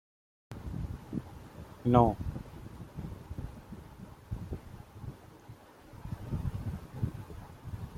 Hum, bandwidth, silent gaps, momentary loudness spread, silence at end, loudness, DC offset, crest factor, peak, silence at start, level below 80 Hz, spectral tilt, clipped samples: none; 16 kHz; none; 22 LU; 0 s; -35 LUFS; under 0.1%; 28 dB; -8 dBFS; 0.5 s; -48 dBFS; -9 dB/octave; under 0.1%